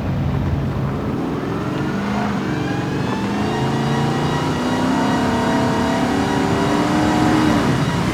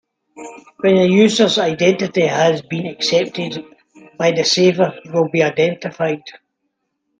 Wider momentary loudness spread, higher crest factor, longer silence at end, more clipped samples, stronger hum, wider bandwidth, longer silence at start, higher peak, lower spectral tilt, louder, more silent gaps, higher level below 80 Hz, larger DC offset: second, 6 LU vs 14 LU; about the same, 14 dB vs 16 dB; second, 0 s vs 0.9 s; neither; neither; first, 15.5 kHz vs 9.8 kHz; second, 0 s vs 0.35 s; second, -4 dBFS vs 0 dBFS; first, -6 dB/octave vs -4.5 dB/octave; second, -19 LUFS vs -16 LUFS; neither; first, -36 dBFS vs -62 dBFS; neither